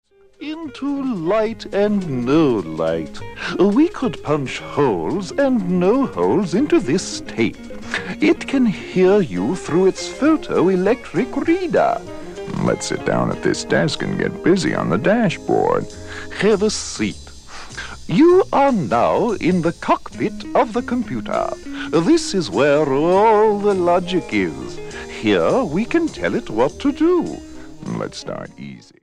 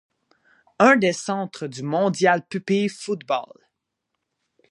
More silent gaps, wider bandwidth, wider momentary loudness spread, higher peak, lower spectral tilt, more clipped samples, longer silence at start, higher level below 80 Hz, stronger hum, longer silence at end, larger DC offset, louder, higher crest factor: neither; about the same, 10.5 kHz vs 11.5 kHz; about the same, 14 LU vs 12 LU; about the same, -2 dBFS vs -2 dBFS; about the same, -6 dB/octave vs -5 dB/octave; neither; second, 0.4 s vs 0.8 s; first, -44 dBFS vs -72 dBFS; neither; second, 0.25 s vs 1.25 s; neither; first, -18 LUFS vs -22 LUFS; second, 16 dB vs 22 dB